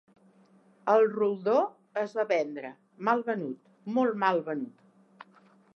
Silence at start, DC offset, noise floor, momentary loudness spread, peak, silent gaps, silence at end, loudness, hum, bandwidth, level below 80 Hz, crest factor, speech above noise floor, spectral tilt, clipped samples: 0.85 s; under 0.1%; -61 dBFS; 15 LU; -10 dBFS; none; 1.05 s; -29 LUFS; none; 6.6 kHz; -90 dBFS; 20 dB; 34 dB; -7 dB/octave; under 0.1%